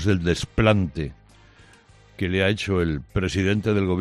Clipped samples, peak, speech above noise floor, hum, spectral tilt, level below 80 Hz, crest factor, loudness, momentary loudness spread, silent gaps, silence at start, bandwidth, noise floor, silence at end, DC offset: under 0.1%; -6 dBFS; 30 dB; none; -6.5 dB/octave; -40 dBFS; 18 dB; -23 LUFS; 9 LU; none; 0 s; 11.5 kHz; -52 dBFS; 0 s; under 0.1%